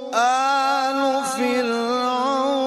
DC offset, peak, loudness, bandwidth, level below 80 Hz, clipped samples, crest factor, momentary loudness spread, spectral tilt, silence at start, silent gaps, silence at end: under 0.1%; -6 dBFS; -20 LUFS; 14.5 kHz; -70 dBFS; under 0.1%; 14 dB; 3 LU; -2 dB/octave; 0 s; none; 0 s